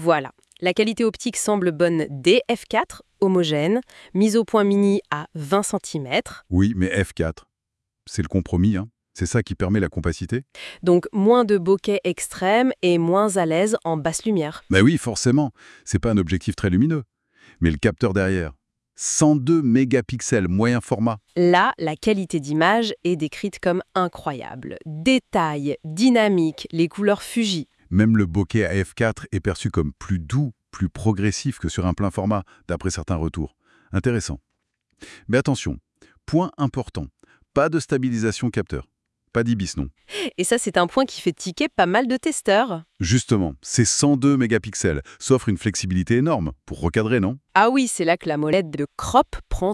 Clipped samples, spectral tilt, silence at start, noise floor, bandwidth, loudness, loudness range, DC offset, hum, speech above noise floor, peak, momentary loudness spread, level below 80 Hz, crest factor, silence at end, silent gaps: under 0.1%; -5.5 dB/octave; 0 s; -82 dBFS; 12 kHz; -21 LUFS; 5 LU; under 0.1%; none; 62 dB; -2 dBFS; 10 LU; -44 dBFS; 20 dB; 0 s; none